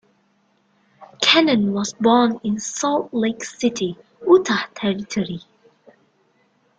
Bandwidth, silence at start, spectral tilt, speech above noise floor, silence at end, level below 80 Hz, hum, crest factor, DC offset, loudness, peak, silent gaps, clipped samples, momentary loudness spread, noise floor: 9.4 kHz; 1 s; -4 dB/octave; 43 dB; 1.4 s; -62 dBFS; none; 20 dB; under 0.1%; -19 LUFS; -2 dBFS; none; under 0.1%; 11 LU; -63 dBFS